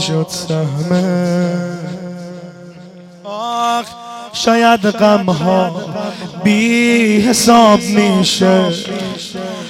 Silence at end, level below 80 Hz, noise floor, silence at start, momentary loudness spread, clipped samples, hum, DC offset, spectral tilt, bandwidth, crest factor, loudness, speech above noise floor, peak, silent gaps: 0 s; -52 dBFS; -36 dBFS; 0 s; 17 LU; under 0.1%; none; under 0.1%; -5 dB/octave; 16.5 kHz; 14 dB; -13 LUFS; 23 dB; 0 dBFS; none